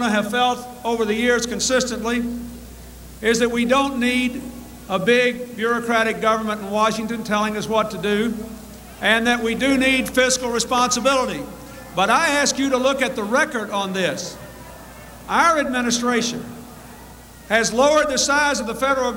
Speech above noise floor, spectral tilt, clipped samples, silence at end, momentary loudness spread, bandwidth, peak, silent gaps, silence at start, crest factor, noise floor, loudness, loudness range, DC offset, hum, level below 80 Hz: 22 dB; -3 dB/octave; under 0.1%; 0 s; 20 LU; 19.5 kHz; -4 dBFS; none; 0 s; 18 dB; -41 dBFS; -19 LUFS; 3 LU; under 0.1%; none; -46 dBFS